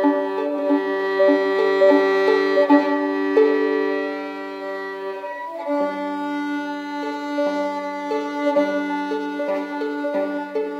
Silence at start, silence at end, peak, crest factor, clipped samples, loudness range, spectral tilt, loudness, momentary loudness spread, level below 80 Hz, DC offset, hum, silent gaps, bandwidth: 0 s; 0 s; -4 dBFS; 18 dB; under 0.1%; 8 LU; -5 dB/octave; -21 LUFS; 12 LU; under -90 dBFS; under 0.1%; none; none; 8 kHz